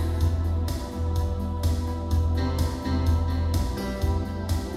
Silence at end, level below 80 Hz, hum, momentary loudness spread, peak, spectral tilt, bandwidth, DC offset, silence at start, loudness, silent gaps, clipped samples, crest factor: 0 s; -30 dBFS; none; 4 LU; -12 dBFS; -7 dB/octave; 14 kHz; under 0.1%; 0 s; -27 LUFS; none; under 0.1%; 12 dB